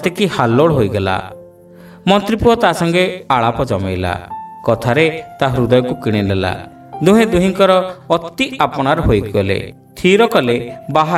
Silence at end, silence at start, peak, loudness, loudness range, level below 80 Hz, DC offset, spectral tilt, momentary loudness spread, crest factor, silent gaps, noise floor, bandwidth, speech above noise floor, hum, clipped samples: 0 s; 0 s; 0 dBFS; -15 LUFS; 2 LU; -36 dBFS; under 0.1%; -6 dB/octave; 10 LU; 14 dB; none; -39 dBFS; 15.5 kHz; 25 dB; none; under 0.1%